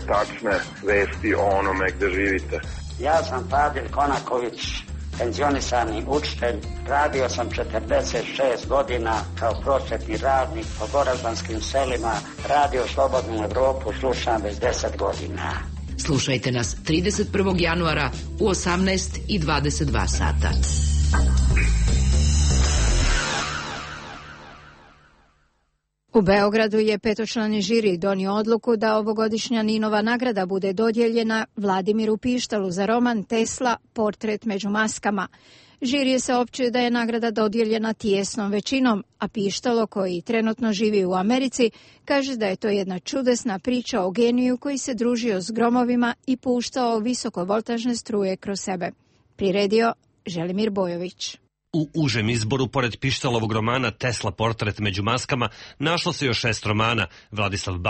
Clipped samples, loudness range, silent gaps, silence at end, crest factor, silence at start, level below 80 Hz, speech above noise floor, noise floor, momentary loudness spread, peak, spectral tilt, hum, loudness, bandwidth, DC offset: under 0.1%; 3 LU; none; 0 s; 16 dB; 0 s; -32 dBFS; 49 dB; -72 dBFS; 7 LU; -6 dBFS; -5 dB/octave; none; -23 LUFS; 8.8 kHz; under 0.1%